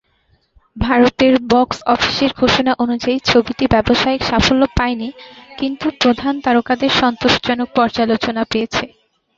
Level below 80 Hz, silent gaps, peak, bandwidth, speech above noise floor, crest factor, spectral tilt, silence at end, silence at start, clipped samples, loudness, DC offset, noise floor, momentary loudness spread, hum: -36 dBFS; none; 0 dBFS; 7.6 kHz; 44 dB; 16 dB; -5 dB/octave; 0.5 s; 0.75 s; under 0.1%; -15 LUFS; under 0.1%; -59 dBFS; 8 LU; none